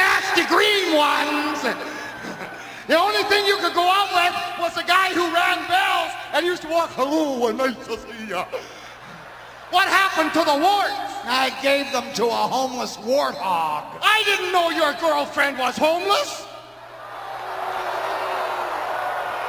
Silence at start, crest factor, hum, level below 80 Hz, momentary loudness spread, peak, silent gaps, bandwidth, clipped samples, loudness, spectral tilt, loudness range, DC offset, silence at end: 0 s; 20 dB; none; -60 dBFS; 16 LU; -2 dBFS; none; 16 kHz; under 0.1%; -20 LUFS; -2 dB/octave; 5 LU; under 0.1%; 0 s